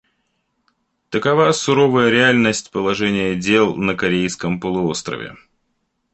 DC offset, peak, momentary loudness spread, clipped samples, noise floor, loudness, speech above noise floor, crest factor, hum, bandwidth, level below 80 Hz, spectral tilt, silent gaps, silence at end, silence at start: under 0.1%; -2 dBFS; 11 LU; under 0.1%; -70 dBFS; -17 LUFS; 53 dB; 16 dB; none; 8.8 kHz; -52 dBFS; -4.5 dB/octave; none; 0.8 s; 1.1 s